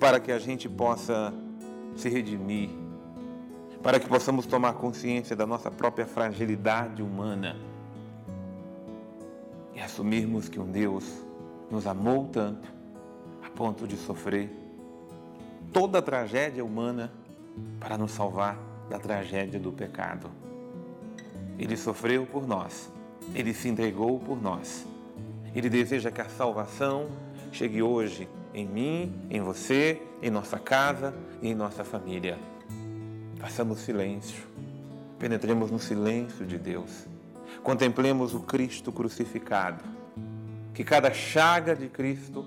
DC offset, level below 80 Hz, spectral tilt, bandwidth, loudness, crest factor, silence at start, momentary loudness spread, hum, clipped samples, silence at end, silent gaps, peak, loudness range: under 0.1%; -70 dBFS; -5.5 dB/octave; 16.5 kHz; -30 LUFS; 22 dB; 0 s; 18 LU; none; under 0.1%; 0 s; none; -10 dBFS; 6 LU